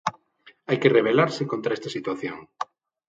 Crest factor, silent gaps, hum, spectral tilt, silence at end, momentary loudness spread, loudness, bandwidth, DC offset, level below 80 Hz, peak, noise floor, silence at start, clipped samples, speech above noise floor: 22 dB; none; none; -6 dB/octave; 0.45 s; 17 LU; -24 LUFS; 7.8 kHz; under 0.1%; -68 dBFS; -4 dBFS; -56 dBFS; 0.05 s; under 0.1%; 33 dB